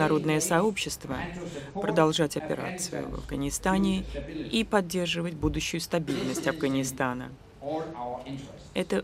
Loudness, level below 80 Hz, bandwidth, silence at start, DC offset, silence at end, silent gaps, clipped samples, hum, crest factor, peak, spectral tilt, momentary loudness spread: -29 LUFS; -46 dBFS; 16 kHz; 0 s; under 0.1%; 0 s; none; under 0.1%; none; 22 dB; -8 dBFS; -4.5 dB/octave; 12 LU